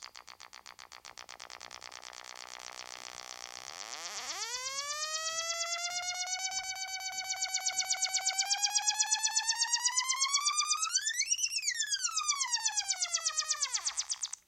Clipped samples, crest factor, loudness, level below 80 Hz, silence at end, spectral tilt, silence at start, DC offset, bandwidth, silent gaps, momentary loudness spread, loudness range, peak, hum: under 0.1%; 20 dB; -31 LUFS; -78 dBFS; 0.1 s; 4.5 dB/octave; 0 s; under 0.1%; 16.5 kHz; none; 18 LU; 15 LU; -16 dBFS; none